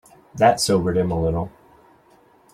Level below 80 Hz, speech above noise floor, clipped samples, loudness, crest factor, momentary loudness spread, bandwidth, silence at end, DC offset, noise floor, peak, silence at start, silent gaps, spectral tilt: -44 dBFS; 36 dB; under 0.1%; -20 LUFS; 20 dB; 15 LU; 15.5 kHz; 1.05 s; under 0.1%; -55 dBFS; -2 dBFS; 0.35 s; none; -5 dB/octave